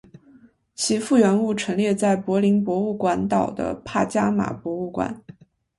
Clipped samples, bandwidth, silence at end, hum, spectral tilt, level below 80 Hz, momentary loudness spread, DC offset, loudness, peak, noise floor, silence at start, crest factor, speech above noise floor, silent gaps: under 0.1%; 11.5 kHz; 0.6 s; none; -5.5 dB/octave; -56 dBFS; 10 LU; under 0.1%; -22 LUFS; -6 dBFS; -53 dBFS; 0.8 s; 16 dB; 32 dB; none